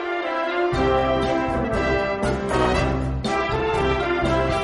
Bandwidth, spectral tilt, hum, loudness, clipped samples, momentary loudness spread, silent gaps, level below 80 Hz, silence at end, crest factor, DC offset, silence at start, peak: 11.5 kHz; -6 dB/octave; none; -22 LUFS; under 0.1%; 4 LU; none; -32 dBFS; 0 s; 14 dB; under 0.1%; 0 s; -6 dBFS